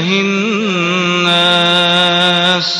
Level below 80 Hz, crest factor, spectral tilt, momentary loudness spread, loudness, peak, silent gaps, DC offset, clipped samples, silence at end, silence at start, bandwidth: -58 dBFS; 12 dB; -4 dB/octave; 5 LU; -11 LUFS; 0 dBFS; none; under 0.1%; under 0.1%; 0 s; 0 s; 12 kHz